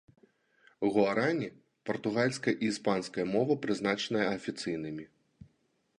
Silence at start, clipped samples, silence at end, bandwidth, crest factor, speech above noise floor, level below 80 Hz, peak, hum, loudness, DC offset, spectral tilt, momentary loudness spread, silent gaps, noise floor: 0.8 s; under 0.1%; 0.55 s; 11 kHz; 20 dB; 43 dB; -70 dBFS; -12 dBFS; none; -31 LUFS; under 0.1%; -5.5 dB/octave; 10 LU; none; -74 dBFS